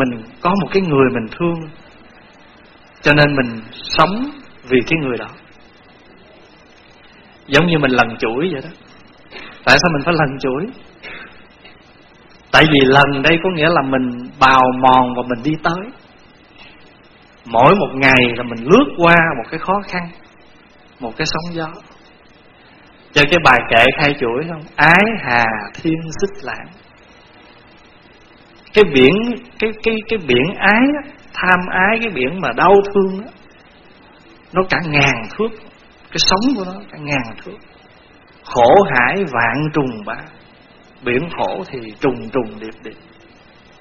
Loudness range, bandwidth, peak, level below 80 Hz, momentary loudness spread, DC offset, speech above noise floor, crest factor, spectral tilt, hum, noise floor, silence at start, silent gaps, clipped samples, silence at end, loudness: 8 LU; 11 kHz; 0 dBFS; -42 dBFS; 18 LU; under 0.1%; 31 dB; 16 dB; -5 dB/octave; none; -46 dBFS; 0 s; none; under 0.1%; 0.85 s; -14 LUFS